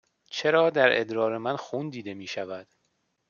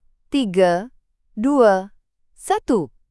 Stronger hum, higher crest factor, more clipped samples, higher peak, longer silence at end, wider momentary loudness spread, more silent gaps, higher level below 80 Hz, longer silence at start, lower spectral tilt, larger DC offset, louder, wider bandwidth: neither; about the same, 22 dB vs 18 dB; neither; second, -6 dBFS vs -2 dBFS; first, 0.7 s vs 0.25 s; second, 16 LU vs 22 LU; neither; second, -76 dBFS vs -52 dBFS; about the same, 0.3 s vs 0.3 s; about the same, -5 dB/octave vs -5.5 dB/octave; neither; second, -26 LUFS vs -19 LUFS; second, 7.2 kHz vs 12 kHz